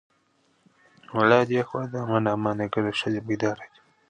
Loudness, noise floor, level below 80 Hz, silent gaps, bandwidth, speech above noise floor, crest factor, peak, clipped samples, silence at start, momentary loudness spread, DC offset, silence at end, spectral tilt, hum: -25 LUFS; -67 dBFS; -62 dBFS; none; 9.6 kHz; 42 dB; 24 dB; -2 dBFS; under 0.1%; 1.1 s; 10 LU; under 0.1%; 0.45 s; -6.5 dB/octave; none